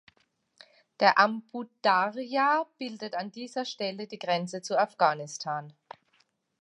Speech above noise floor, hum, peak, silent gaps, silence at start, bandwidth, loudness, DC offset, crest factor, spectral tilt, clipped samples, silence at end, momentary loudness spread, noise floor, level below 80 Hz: 42 dB; none; -6 dBFS; none; 1 s; 11.5 kHz; -28 LUFS; under 0.1%; 24 dB; -4 dB/octave; under 0.1%; 0.9 s; 13 LU; -71 dBFS; -84 dBFS